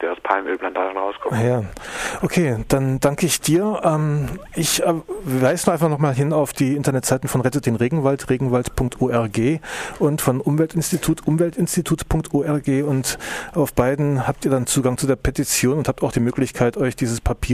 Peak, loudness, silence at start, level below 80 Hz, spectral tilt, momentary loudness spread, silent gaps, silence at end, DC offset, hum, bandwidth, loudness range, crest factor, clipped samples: -2 dBFS; -20 LUFS; 0 s; -38 dBFS; -5.5 dB/octave; 6 LU; none; 0 s; under 0.1%; none; 15.5 kHz; 1 LU; 18 dB; under 0.1%